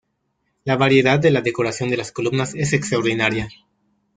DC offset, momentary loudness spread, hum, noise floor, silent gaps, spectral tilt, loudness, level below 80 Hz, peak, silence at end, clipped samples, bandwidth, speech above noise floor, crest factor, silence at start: under 0.1%; 9 LU; none; -71 dBFS; none; -5.5 dB/octave; -19 LUFS; -52 dBFS; -2 dBFS; 0.65 s; under 0.1%; 9.4 kHz; 52 dB; 18 dB; 0.65 s